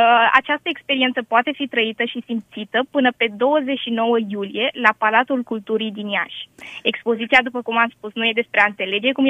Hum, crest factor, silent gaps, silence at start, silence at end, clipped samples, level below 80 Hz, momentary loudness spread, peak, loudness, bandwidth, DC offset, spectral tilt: none; 18 dB; none; 0 s; 0 s; under 0.1%; -64 dBFS; 8 LU; 0 dBFS; -19 LUFS; 9.6 kHz; under 0.1%; -5 dB/octave